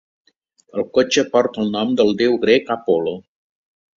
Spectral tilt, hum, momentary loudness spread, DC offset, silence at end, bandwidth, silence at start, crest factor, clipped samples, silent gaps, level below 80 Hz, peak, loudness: -4.5 dB/octave; none; 10 LU; under 0.1%; 0.8 s; 7.8 kHz; 0.75 s; 18 dB; under 0.1%; none; -60 dBFS; -2 dBFS; -18 LUFS